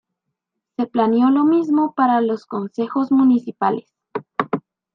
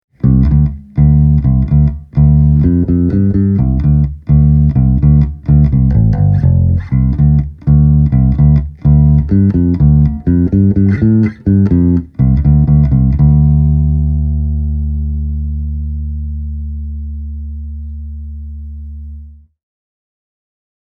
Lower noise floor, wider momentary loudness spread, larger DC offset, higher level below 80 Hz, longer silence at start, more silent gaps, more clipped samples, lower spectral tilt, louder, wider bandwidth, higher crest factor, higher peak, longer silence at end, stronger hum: first, -79 dBFS vs -33 dBFS; about the same, 13 LU vs 15 LU; neither; second, -72 dBFS vs -16 dBFS; first, 0.8 s vs 0.25 s; neither; neither; second, -8.5 dB/octave vs -13 dB/octave; second, -19 LUFS vs -11 LUFS; first, 5.8 kHz vs 2.2 kHz; first, 16 dB vs 10 dB; about the same, -2 dBFS vs 0 dBFS; second, 0.35 s vs 1.5 s; neither